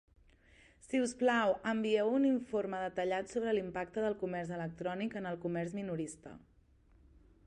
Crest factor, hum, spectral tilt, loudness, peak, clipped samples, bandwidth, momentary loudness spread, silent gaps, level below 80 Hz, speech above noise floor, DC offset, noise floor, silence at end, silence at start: 16 dB; none; -5.5 dB/octave; -35 LUFS; -20 dBFS; under 0.1%; 11 kHz; 9 LU; none; -66 dBFS; 31 dB; under 0.1%; -66 dBFS; 1.1 s; 0.85 s